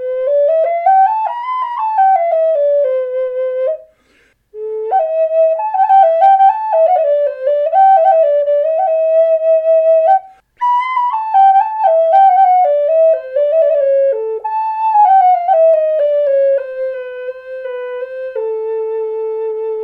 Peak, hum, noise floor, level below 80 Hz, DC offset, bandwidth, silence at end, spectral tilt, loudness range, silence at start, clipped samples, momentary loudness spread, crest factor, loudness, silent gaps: -2 dBFS; none; -54 dBFS; -66 dBFS; under 0.1%; 4.4 kHz; 0 s; -3 dB/octave; 6 LU; 0 s; under 0.1%; 13 LU; 10 dB; -12 LUFS; none